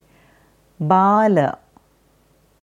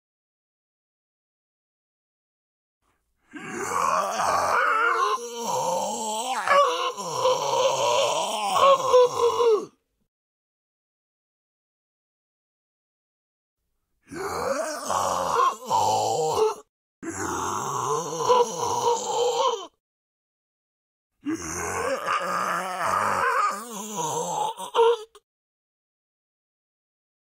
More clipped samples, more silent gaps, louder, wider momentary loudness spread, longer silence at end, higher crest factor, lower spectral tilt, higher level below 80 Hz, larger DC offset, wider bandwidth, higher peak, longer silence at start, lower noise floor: neither; second, none vs 10.08-13.57 s, 16.69-17.02 s, 19.80-21.10 s; first, -17 LUFS vs -24 LUFS; about the same, 14 LU vs 12 LU; second, 1.1 s vs 2.25 s; about the same, 18 dB vs 20 dB; first, -8.5 dB/octave vs -2 dB/octave; first, -62 dBFS vs -68 dBFS; neither; second, 10 kHz vs 16 kHz; first, -2 dBFS vs -6 dBFS; second, 0.8 s vs 3.35 s; second, -58 dBFS vs -74 dBFS